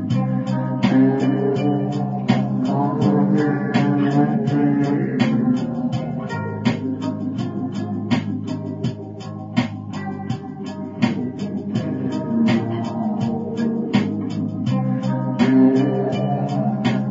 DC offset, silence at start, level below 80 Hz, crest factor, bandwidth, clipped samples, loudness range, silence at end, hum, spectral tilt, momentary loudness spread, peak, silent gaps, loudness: under 0.1%; 0 s; -58 dBFS; 16 dB; 7.6 kHz; under 0.1%; 7 LU; 0 s; none; -8 dB/octave; 10 LU; -4 dBFS; none; -21 LUFS